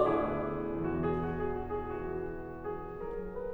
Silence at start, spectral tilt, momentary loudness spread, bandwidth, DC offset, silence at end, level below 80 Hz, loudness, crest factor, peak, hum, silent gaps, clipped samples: 0 s; -9.5 dB/octave; 8 LU; 4.6 kHz; under 0.1%; 0 s; -48 dBFS; -36 LUFS; 20 dB; -14 dBFS; none; none; under 0.1%